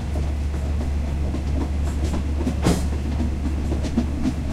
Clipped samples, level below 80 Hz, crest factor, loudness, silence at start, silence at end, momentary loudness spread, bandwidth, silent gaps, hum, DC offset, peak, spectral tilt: under 0.1%; -26 dBFS; 16 dB; -25 LUFS; 0 s; 0 s; 4 LU; 12.5 kHz; none; none; under 0.1%; -6 dBFS; -7 dB/octave